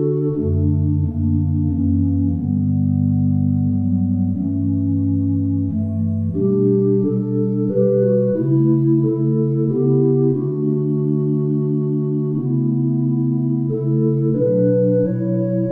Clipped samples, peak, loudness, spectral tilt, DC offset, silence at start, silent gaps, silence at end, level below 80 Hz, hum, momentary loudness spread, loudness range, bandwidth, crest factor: under 0.1%; -4 dBFS; -18 LUFS; -14.5 dB/octave; under 0.1%; 0 s; none; 0 s; -46 dBFS; none; 4 LU; 2 LU; 1.8 kHz; 12 dB